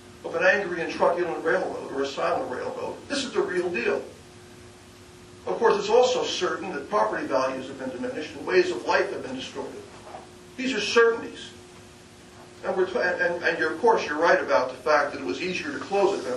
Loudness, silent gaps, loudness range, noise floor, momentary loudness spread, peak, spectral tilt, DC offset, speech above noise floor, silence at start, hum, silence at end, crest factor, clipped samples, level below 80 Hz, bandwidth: -25 LUFS; none; 5 LU; -48 dBFS; 14 LU; -6 dBFS; -3.5 dB/octave; under 0.1%; 23 dB; 0 s; none; 0 s; 20 dB; under 0.1%; -62 dBFS; 12 kHz